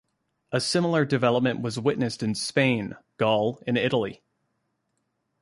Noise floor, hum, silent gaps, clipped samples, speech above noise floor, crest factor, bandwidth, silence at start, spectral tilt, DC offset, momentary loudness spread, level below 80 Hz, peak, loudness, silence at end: -76 dBFS; none; none; under 0.1%; 52 dB; 18 dB; 11.5 kHz; 0.5 s; -5 dB/octave; under 0.1%; 6 LU; -62 dBFS; -8 dBFS; -25 LUFS; 1.25 s